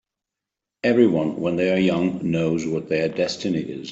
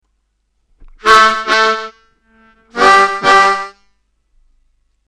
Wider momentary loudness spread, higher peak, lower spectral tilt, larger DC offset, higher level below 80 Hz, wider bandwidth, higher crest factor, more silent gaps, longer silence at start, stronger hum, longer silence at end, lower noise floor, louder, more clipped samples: second, 7 LU vs 17 LU; second, -4 dBFS vs 0 dBFS; first, -6.5 dB/octave vs -1.5 dB/octave; neither; second, -60 dBFS vs -46 dBFS; second, 8 kHz vs 13 kHz; about the same, 18 dB vs 14 dB; neither; second, 0.85 s vs 1.05 s; neither; second, 0 s vs 1.4 s; first, -86 dBFS vs -64 dBFS; second, -22 LUFS vs -10 LUFS; neither